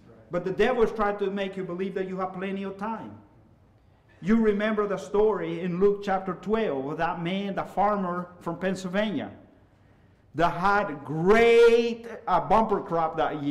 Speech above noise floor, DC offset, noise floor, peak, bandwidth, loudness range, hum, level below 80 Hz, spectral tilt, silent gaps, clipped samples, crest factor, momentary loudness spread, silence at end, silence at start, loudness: 34 dB; under 0.1%; -59 dBFS; -12 dBFS; 11.5 kHz; 7 LU; none; -48 dBFS; -6.5 dB/octave; none; under 0.1%; 14 dB; 11 LU; 0 s; 0.1 s; -26 LUFS